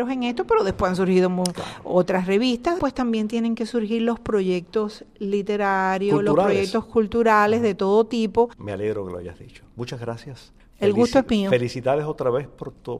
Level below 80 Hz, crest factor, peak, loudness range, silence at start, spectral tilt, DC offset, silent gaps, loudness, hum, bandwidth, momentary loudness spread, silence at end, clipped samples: -48 dBFS; 18 dB; -4 dBFS; 4 LU; 0 s; -6 dB/octave; under 0.1%; none; -22 LUFS; none; 13.5 kHz; 13 LU; 0 s; under 0.1%